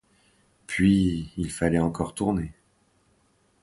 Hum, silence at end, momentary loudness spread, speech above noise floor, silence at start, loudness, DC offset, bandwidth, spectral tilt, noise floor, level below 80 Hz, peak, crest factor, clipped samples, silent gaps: none; 1.1 s; 11 LU; 42 dB; 0.7 s; -25 LUFS; under 0.1%; 11.5 kHz; -6.5 dB/octave; -66 dBFS; -44 dBFS; -8 dBFS; 18 dB; under 0.1%; none